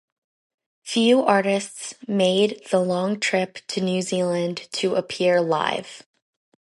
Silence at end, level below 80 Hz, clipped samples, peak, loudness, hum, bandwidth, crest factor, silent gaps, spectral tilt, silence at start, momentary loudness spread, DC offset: 0.65 s; -72 dBFS; under 0.1%; -2 dBFS; -22 LUFS; none; 11.5 kHz; 22 dB; none; -4.5 dB/octave; 0.85 s; 9 LU; under 0.1%